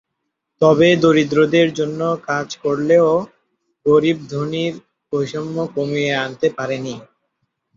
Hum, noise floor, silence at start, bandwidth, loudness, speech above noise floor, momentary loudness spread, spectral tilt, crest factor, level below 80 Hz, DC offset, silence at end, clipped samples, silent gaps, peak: none; -76 dBFS; 0.6 s; 7.6 kHz; -17 LUFS; 59 dB; 12 LU; -6 dB/octave; 16 dB; -58 dBFS; under 0.1%; 0.7 s; under 0.1%; none; -2 dBFS